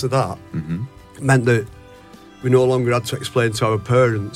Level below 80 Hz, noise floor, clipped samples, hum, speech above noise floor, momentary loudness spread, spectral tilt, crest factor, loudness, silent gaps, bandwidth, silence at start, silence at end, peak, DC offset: -50 dBFS; -43 dBFS; under 0.1%; none; 25 dB; 12 LU; -6 dB/octave; 16 dB; -19 LUFS; none; 15 kHz; 0 s; 0 s; -2 dBFS; under 0.1%